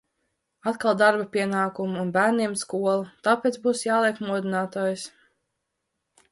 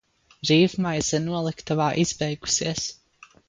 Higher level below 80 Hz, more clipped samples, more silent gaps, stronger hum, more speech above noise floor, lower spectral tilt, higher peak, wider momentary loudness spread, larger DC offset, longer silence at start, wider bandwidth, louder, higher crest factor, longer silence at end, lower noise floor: second, -72 dBFS vs -54 dBFS; neither; neither; neither; first, 56 dB vs 30 dB; about the same, -4.5 dB/octave vs -4 dB/octave; about the same, -6 dBFS vs -6 dBFS; about the same, 8 LU vs 9 LU; neither; first, 0.65 s vs 0.45 s; first, 11.5 kHz vs 9.6 kHz; about the same, -24 LUFS vs -24 LUFS; about the same, 20 dB vs 18 dB; first, 1.25 s vs 0.55 s; first, -80 dBFS vs -54 dBFS